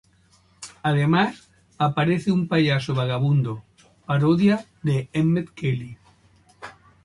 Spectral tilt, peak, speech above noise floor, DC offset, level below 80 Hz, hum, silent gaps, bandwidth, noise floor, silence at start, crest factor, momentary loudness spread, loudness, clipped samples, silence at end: -7.5 dB/octave; -6 dBFS; 38 dB; under 0.1%; -56 dBFS; none; none; 11.5 kHz; -59 dBFS; 0.6 s; 16 dB; 22 LU; -22 LUFS; under 0.1%; 0.35 s